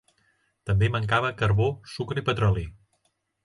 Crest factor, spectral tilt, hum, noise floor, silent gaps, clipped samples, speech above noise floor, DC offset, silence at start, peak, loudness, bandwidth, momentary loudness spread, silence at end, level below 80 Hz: 18 dB; -7 dB/octave; none; -73 dBFS; none; under 0.1%; 49 dB; under 0.1%; 0.65 s; -8 dBFS; -25 LUFS; 11 kHz; 10 LU; 0.7 s; -42 dBFS